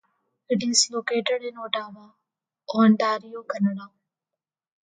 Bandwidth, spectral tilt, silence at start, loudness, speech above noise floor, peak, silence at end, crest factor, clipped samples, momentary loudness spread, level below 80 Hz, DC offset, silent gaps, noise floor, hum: 9.6 kHz; -3.5 dB/octave; 0.5 s; -24 LUFS; 65 dB; -6 dBFS; 1.1 s; 20 dB; under 0.1%; 12 LU; -74 dBFS; under 0.1%; none; -89 dBFS; none